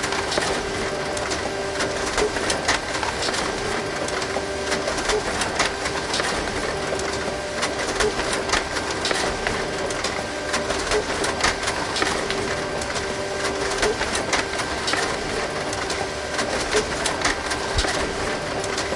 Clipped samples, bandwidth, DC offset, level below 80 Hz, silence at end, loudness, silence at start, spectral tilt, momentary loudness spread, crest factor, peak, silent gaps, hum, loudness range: under 0.1%; 11.5 kHz; under 0.1%; -40 dBFS; 0 s; -23 LUFS; 0 s; -2.5 dB/octave; 4 LU; 20 dB; -4 dBFS; none; none; 0 LU